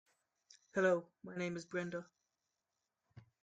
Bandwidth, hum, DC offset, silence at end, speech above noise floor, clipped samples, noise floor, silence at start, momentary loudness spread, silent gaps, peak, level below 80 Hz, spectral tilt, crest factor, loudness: 9.2 kHz; none; under 0.1%; 0.2 s; 51 dB; under 0.1%; -89 dBFS; 0.75 s; 13 LU; none; -22 dBFS; -82 dBFS; -6 dB/octave; 22 dB; -39 LUFS